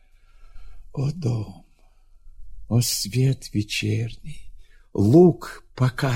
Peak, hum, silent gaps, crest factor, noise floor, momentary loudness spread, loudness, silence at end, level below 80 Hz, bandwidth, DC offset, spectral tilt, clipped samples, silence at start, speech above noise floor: -4 dBFS; none; none; 20 dB; -53 dBFS; 21 LU; -22 LUFS; 0 s; -46 dBFS; 16.5 kHz; under 0.1%; -6 dB/octave; under 0.1%; 0.4 s; 32 dB